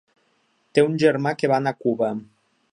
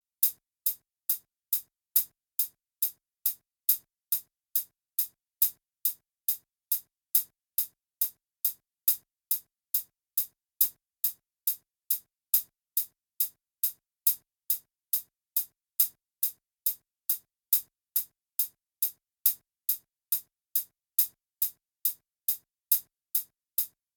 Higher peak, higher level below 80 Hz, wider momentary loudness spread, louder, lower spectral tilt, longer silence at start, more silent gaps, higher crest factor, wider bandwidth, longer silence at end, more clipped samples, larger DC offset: first, -2 dBFS vs -6 dBFS; first, -70 dBFS vs -88 dBFS; about the same, 7 LU vs 5 LU; first, -21 LUFS vs -30 LUFS; first, -6.5 dB/octave vs 3 dB/octave; first, 0.75 s vs 0.2 s; neither; second, 20 dB vs 26 dB; second, 10.5 kHz vs over 20 kHz; first, 0.5 s vs 0.3 s; neither; neither